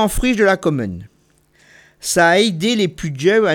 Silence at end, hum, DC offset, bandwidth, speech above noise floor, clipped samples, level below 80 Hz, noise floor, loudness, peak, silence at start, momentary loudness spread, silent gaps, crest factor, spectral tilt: 0 s; none; under 0.1%; 19 kHz; 41 dB; under 0.1%; -34 dBFS; -57 dBFS; -16 LUFS; -2 dBFS; 0 s; 13 LU; none; 14 dB; -4 dB/octave